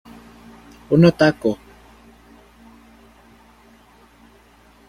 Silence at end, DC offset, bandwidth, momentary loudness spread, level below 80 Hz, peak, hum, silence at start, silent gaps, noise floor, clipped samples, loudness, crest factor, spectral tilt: 3.35 s; under 0.1%; 11.5 kHz; 12 LU; -50 dBFS; -2 dBFS; none; 0.9 s; none; -51 dBFS; under 0.1%; -17 LUFS; 22 dB; -7.5 dB/octave